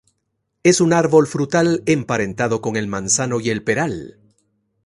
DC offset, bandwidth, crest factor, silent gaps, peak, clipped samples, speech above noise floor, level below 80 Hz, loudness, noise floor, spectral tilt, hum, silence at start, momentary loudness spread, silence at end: under 0.1%; 11.5 kHz; 18 dB; none; 0 dBFS; under 0.1%; 55 dB; -52 dBFS; -18 LUFS; -73 dBFS; -4.5 dB/octave; none; 0.65 s; 8 LU; 0.75 s